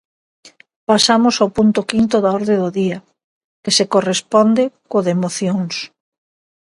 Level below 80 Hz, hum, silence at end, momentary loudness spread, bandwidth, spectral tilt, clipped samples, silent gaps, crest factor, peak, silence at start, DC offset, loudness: -56 dBFS; none; 0.8 s; 11 LU; 11.5 kHz; -4.5 dB/octave; under 0.1%; 0.76-0.87 s, 3.24-3.63 s; 16 dB; 0 dBFS; 0.45 s; under 0.1%; -16 LUFS